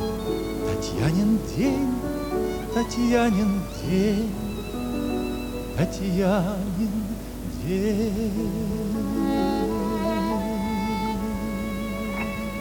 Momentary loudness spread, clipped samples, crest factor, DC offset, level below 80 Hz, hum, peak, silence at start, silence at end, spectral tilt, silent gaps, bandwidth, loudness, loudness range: 7 LU; under 0.1%; 18 dB; under 0.1%; -38 dBFS; none; -8 dBFS; 0 s; 0 s; -6.5 dB/octave; none; 19.5 kHz; -26 LUFS; 2 LU